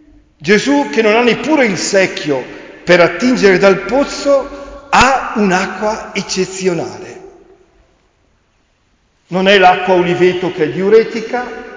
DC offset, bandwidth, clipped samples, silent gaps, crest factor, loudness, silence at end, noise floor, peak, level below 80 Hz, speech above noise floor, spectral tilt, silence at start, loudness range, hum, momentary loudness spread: under 0.1%; 7.6 kHz; under 0.1%; none; 14 dB; -12 LUFS; 0 s; -57 dBFS; 0 dBFS; -42 dBFS; 45 dB; -4.5 dB/octave; 0.4 s; 9 LU; none; 12 LU